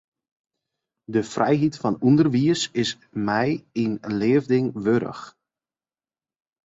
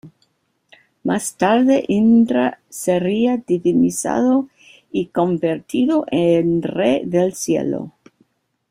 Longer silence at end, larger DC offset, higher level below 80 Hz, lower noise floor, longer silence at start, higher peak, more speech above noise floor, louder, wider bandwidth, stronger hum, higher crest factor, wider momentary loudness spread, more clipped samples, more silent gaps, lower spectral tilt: first, 1.35 s vs 0.8 s; neither; about the same, -60 dBFS vs -58 dBFS; first, under -90 dBFS vs -65 dBFS; first, 1.1 s vs 0.05 s; second, -6 dBFS vs -2 dBFS; first, over 68 dB vs 48 dB; second, -22 LUFS vs -18 LUFS; second, 8 kHz vs 16 kHz; neither; about the same, 18 dB vs 16 dB; about the same, 8 LU vs 10 LU; neither; neither; about the same, -6 dB/octave vs -5.5 dB/octave